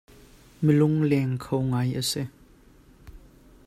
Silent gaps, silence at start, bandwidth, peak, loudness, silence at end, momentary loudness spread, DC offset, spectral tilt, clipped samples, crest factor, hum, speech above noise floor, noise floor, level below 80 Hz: none; 0.6 s; 14.5 kHz; -8 dBFS; -25 LUFS; 0.5 s; 8 LU; under 0.1%; -6.5 dB/octave; under 0.1%; 18 dB; none; 31 dB; -54 dBFS; -54 dBFS